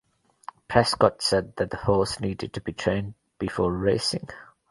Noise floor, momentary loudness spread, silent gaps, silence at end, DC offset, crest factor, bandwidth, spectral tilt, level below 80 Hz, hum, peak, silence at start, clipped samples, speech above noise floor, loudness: -46 dBFS; 20 LU; none; 0.25 s; under 0.1%; 24 dB; 11.5 kHz; -5 dB/octave; -46 dBFS; none; -2 dBFS; 0.7 s; under 0.1%; 21 dB; -25 LUFS